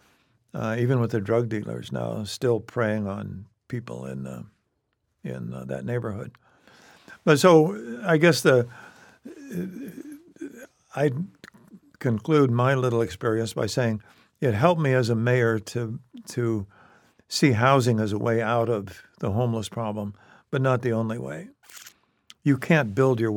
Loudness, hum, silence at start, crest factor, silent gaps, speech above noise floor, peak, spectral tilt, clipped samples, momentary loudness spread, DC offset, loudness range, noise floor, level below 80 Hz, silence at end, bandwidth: -24 LUFS; none; 0.55 s; 22 dB; none; 51 dB; -4 dBFS; -6.5 dB/octave; under 0.1%; 19 LU; under 0.1%; 11 LU; -75 dBFS; -64 dBFS; 0 s; 18 kHz